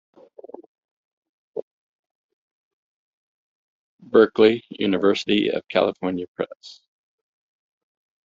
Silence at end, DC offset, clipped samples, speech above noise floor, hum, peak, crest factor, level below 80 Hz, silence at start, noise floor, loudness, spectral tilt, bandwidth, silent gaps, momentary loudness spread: 1.5 s; under 0.1%; under 0.1%; 23 dB; none; -2 dBFS; 22 dB; -66 dBFS; 1.55 s; -43 dBFS; -21 LUFS; -3.5 dB/octave; 7.6 kHz; 1.62-2.03 s, 2.11-3.99 s, 6.28-6.35 s; 19 LU